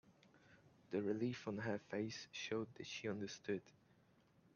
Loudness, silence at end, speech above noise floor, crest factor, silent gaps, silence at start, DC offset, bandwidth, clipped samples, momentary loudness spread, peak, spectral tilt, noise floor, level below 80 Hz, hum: -45 LUFS; 0.85 s; 28 dB; 18 dB; none; 0.1 s; under 0.1%; 7.2 kHz; under 0.1%; 5 LU; -28 dBFS; -5 dB/octave; -73 dBFS; -84 dBFS; none